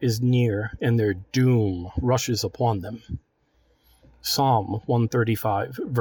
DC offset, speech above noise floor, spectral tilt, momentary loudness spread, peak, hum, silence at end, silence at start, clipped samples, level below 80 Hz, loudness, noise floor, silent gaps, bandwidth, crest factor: under 0.1%; 42 dB; -6 dB/octave; 10 LU; -8 dBFS; none; 0 s; 0 s; under 0.1%; -46 dBFS; -24 LUFS; -65 dBFS; none; 19 kHz; 14 dB